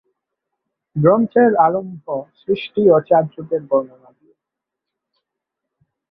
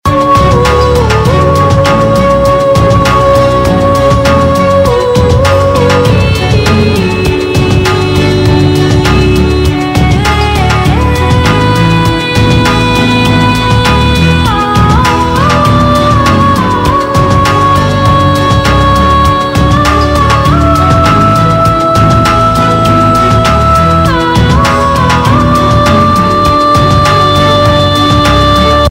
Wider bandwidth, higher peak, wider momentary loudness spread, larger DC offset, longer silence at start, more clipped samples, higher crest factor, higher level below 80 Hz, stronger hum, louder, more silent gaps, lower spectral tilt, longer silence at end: second, 5 kHz vs 16.5 kHz; about the same, -2 dBFS vs 0 dBFS; first, 14 LU vs 2 LU; neither; first, 0.95 s vs 0.05 s; second, under 0.1% vs 1%; first, 18 dB vs 6 dB; second, -60 dBFS vs -18 dBFS; neither; second, -17 LUFS vs -7 LUFS; neither; first, -11 dB/octave vs -6 dB/octave; first, 2.25 s vs 0 s